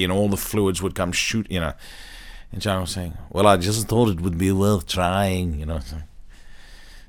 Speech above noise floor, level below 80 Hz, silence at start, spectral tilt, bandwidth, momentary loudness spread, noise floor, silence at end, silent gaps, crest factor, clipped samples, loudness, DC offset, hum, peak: 20 dB; -38 dBFS; 0 s; -5 dB/octave; 19.5 kHz; 18 LU; -42 dBFS; 0.05 s; none; 20 dB; under 0.1%; -22 LUFS; under 0.1%; none; -2 dBFS